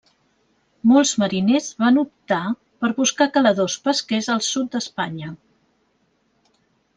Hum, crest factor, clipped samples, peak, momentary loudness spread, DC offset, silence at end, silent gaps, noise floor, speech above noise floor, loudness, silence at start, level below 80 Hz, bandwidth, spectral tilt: none; 18 dB; under 0.1%; -2 dBFS; 11 LU; under 0.1%; 1.6 s; none; -65 dBFS; 46 dB; -20 LUFS; 0.85 s; -66 dBFS; 10 kHz; -4 dB/octave